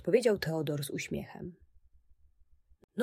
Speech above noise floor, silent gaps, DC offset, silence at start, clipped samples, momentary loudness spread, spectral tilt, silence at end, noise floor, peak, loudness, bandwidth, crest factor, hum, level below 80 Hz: 32 dB; 2.84-2.88 s; under 0.1%; 0 s; under 0.1%; 18 LU; -5.5 dB/octave; 0 s; -64 dBFS; -14 dBFS; -33 LUFS; 16 kHz; 20 dB; none; -62 dBFS